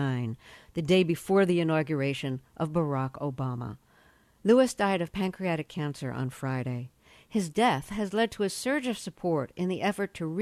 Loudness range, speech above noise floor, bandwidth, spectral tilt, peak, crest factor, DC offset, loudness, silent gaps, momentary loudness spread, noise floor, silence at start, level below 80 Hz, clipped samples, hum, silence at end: 3 LU; 33 dB; 14.5 kHz; -6 dB/octave; -8 dBFS; 20 dB; under 0.1%; -29 LUFS; none; 11 LU; -61 dBFS; 0 s; -60 dBFS; under 0.1%; none; 0 s